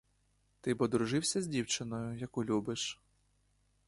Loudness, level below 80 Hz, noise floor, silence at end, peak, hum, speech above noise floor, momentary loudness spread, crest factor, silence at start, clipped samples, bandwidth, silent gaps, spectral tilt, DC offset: -35 LUFS; -66 dBFS; -74 dBFS; 0.95 s; -18 dBFS; 50 Hz at -60 dBFS; 39 dB; 8 LU; 20 dB; 0.65 s; under 0.1%; 11.5 kHz; none; -4 dB/octave; under 0.1%